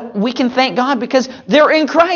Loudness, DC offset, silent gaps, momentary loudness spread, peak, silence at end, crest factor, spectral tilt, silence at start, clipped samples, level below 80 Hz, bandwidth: -14 LUFS; under 0.1%; none; 6 LU; 0 dBFS; 0 s; 14 dB; -4.5 dB/octave; 0 s; under 0.1%; -58 dBFS; 7.2 kHz